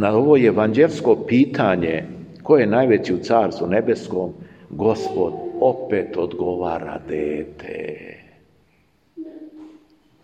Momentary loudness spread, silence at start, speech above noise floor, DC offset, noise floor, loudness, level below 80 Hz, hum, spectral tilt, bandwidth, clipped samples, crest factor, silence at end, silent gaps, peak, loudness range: 20 LU; 0 s; 42 dB; under 0.1%; -61 dBFS; -19 LUFS; -56 dBFS; none; -7.5 dB/octave; 8.4 kHz; under 0.1%; 18 dB; 0.55 s; none; -2 dBFS; 12 LU